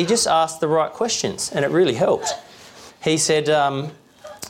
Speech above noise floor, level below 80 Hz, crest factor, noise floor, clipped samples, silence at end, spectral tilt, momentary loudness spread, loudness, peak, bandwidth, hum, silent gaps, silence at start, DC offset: 24 dB; -60 dBFS; 14 dB; -44 dBFS; under 0.1%; 0 s; -3.5 dB/octave; 10 LU; -20 LUFS; -8 dBFS; 16.5 kHz; none; none; 0 s; under 0.1%